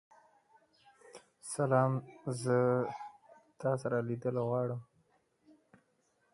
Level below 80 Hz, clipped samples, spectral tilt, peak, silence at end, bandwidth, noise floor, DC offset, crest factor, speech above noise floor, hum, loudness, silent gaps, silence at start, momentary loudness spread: -76 dBFS; under 0.1%; -7 dB/octave; -16 dBFS; 1.5 s; 11.5 kHz; -75 dBFS; under 0.1%; 20 dB; 43 dB; none; -34 LUFS; none; 1.15 s; 17 LU